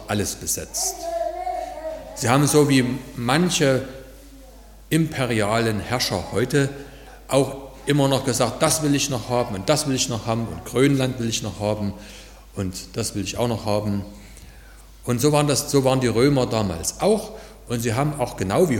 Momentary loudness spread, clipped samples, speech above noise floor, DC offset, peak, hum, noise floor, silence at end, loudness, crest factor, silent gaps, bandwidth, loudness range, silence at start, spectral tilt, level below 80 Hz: 12 LU; under 0.1%; 23 dB; under 0.1%; -2 dBFS; none; -44 dBFS; 0 s; -22 LUFS; 20 dB; none; 17.5 kHz; 4 LU; 0 s; -4.5 dB/octave; -44 dBFS